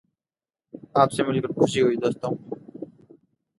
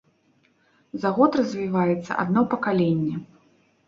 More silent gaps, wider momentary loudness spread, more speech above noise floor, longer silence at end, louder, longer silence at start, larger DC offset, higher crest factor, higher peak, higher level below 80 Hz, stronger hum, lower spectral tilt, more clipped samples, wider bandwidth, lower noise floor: neither; first, 20 LU vs 9 LU; first, over 68 dB vs 41 dB; about the same, 0.75 s vs 0.65 s; about the same, -23 LUFS vs -23 LUFS; second, 0.75 s vs 0.95 s; neither; about the same, 22 dB vs 20 dB; about the same, -4 dBFS vs -4 dBFS; about the same, -64 dBFS vs -64 dBFS; neither; second, -6 dB/octave vs -8 dB/octave; neither; first, 11.5 kHz vs 7.4 kHz; first, under -90 dBFS vs -64 dBFS